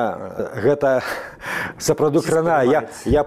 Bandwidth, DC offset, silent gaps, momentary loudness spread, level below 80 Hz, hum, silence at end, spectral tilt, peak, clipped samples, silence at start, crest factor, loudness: 15.5 kHz; under 0.1%; none; 11 LU; -40 dBFS; none; 0 s; -5.5 dB/octave; -4 dBFS; under 0.1%; 0 s; 14 dB; -20 LUFS